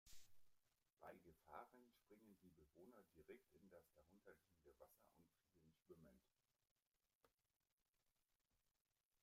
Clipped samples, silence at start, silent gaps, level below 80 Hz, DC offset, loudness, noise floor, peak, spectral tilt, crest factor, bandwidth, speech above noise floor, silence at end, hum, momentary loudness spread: under 0.1%; 0.05 s; 6.71-6.76 s, 6.87-6.92 s, 7.15-7.20 s, 7.56-7.60 s, 7.72-7.78 s, 9.05-9.11 s; -86 dBFS; under 0.1%; -66 LUFS; under -90 dBFS; -42 dBFS; -4.5 dB/octave; 28 dB; 15.5 kHz; over 19 dB; 0.05 s; none; 6 LU